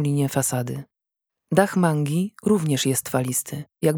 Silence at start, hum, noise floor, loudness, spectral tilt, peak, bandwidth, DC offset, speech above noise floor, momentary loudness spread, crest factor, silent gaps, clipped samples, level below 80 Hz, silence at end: 0 s; none; -86 dBFS; -22 LUFS; -5 dB/octave; -2 dBFS; over 20 kHz; under 0.1%; 64 dB; 7 LU; 22 dB; none; under 0.1%; -62 dBFS; 0 s